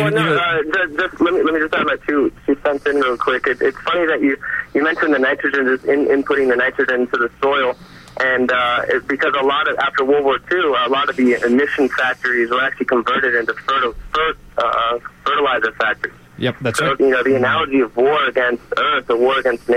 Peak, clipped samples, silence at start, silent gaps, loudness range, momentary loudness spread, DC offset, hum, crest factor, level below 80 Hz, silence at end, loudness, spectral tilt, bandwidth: -6 dBFS; under 0.1%; 0 s; none; 2 LU; 4 LU; under 0.1%; none; 12 dB; -48 dBFS; 0 s; -17 LUFS; -5 dB/octave; 14 kHz